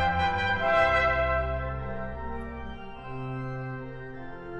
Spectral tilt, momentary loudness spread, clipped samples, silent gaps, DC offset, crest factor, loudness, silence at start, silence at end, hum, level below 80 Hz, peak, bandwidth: -6.5 dB/octave; 18 LU; under 0.1%; none; under 0.1%; 18 dB; -28 LUFS; 0 s; 0 s; none; -40 dBFS; -10 dBFS; 8.4 kHz